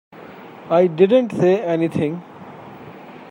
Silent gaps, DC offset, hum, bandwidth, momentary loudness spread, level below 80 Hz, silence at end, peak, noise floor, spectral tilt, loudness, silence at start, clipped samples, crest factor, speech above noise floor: none; under 0.1%; none; 10 kHz; 24 LU; -66 dBFS; 0 s; -2 dBFS; -39 dBFS; -8 dB/octave; -17 LUFS; 0.15 s; under 0.1%; 18 dB; 22 dB